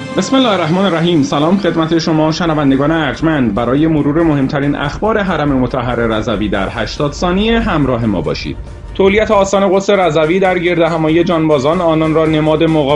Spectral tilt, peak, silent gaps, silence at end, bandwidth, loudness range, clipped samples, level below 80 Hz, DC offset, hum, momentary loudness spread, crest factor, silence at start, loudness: -6.5 dB/octave; 0 dBFS; none; 0 s; 10.5 kHz; 3 LU; under 0.1%; -30 dBFS; under 0.1%; none; 5 LU; 12 dB; 0 s; -13 LUFS